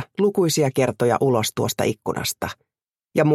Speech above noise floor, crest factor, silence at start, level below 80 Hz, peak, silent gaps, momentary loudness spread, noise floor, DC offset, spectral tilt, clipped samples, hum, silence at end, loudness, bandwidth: 23 dB; 16 dB; 0 s; -56 dBFS; -4 dBFS; none; 7 LU; -43 dBFS; under 0.1%; -5 dB/octave; under 0.1%; none; 0 s; -22 LUFS; 16 kHz